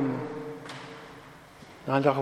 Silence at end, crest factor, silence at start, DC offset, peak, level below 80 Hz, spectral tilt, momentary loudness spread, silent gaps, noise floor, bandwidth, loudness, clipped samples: 0 s; 24 dB; 0 s; under 0.1%; -8 dBFS; -66 dBFS; -7 dB/octave; 23 LU; none; -49 dBFS; 14 kHz; -32 LUFS; under 0.1%